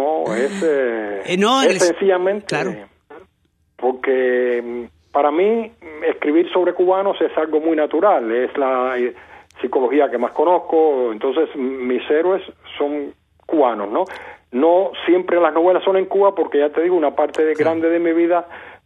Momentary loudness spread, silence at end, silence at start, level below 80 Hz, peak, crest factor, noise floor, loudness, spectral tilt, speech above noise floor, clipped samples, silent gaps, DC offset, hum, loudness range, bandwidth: 8 LU; 0.1 s; 0 s; -64 dBFS; -2 dBFS; 16 dB; -63 dBFS; -18 LUFS; -4.5 dB/octave; 46 dB; under 0.1%; none; under 0.1%; none; 4 LU; 11 kHz